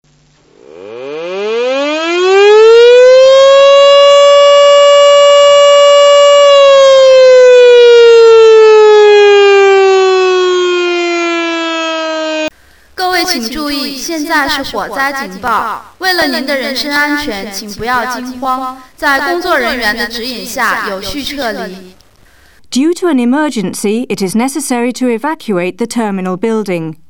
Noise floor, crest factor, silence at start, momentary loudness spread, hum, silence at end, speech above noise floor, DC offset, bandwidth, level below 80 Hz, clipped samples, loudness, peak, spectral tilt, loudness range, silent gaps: -48 dBFS; 8 dB; 0.75 s; 15 LU; none; 0.15 s; 34 dB; under 0.1%; over 20 kHz; -44 dBFS; 0.3%; -8 LUFS; 0 dBFS; -3 dB/octave; 11 LU; none